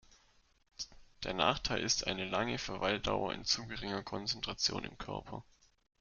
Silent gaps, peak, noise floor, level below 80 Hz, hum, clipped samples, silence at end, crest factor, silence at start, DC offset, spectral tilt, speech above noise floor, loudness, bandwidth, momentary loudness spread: none; -14 dBFS; -69 dBFS; -56 dBFS; none; under 0.1%; 0.6 s; 24 dB; 0.1 s; under 0.1%; -3 dB/octave; 33 dB; -36 LUFS; 11.5 kHz; 14 LU